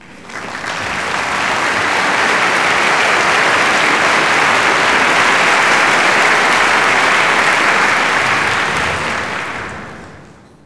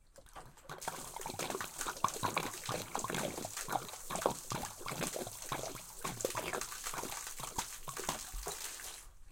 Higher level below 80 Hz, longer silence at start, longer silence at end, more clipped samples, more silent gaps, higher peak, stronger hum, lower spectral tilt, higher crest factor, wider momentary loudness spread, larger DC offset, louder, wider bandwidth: first, -46 dBFS vs -56 dBFS; about the same, 0 s vs 0 s; first, 0.45 s vs 0 s; neither; neither; first, 0 dBFS vs -14 dBFS; neither; about the same, -2 dB/octave vs -2.5 dB/octave; second, 14 dB vs 28 dB; first, 11 LU vs 8 LU; neither; first, -12 LUFS vs -40 LUFS; second, 11 kHz vs 17 kHz